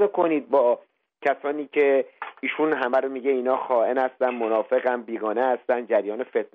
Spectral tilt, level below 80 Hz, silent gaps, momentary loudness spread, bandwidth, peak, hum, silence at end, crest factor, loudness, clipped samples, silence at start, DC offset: -7 dB/octave; -80 dBFS; none; 7 LU; 4.9 kHz; -8 dBFS; none; 0.1 s; 16 dB; -24 LUFS; under 0.1%; 0 s; under 0.1%